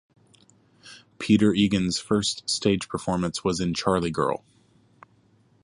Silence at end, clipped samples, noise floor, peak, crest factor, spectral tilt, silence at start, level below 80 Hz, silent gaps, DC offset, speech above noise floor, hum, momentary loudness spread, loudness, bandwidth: 1.25 s; under 0.1%; -61 dBFS; -6 dBFS; 20 dB; -5 dB/octave; 0.85 s; -50 dBFS; none; under 0.1%; 37 dB; none; 7 LU; -24 LUFS; 11.5 kHz